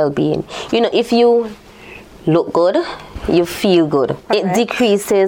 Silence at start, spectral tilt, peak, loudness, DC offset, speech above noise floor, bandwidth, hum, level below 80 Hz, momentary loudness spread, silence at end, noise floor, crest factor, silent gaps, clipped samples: 0 s; -5.5 dB/octave; -2 dBFS; -15 LUFS; under 0.1%; 23 dB; 17 kHz; none; -42 dBFS; 12 LU; 0 s; -37 dBFS; 14 dB; none; under 0.1%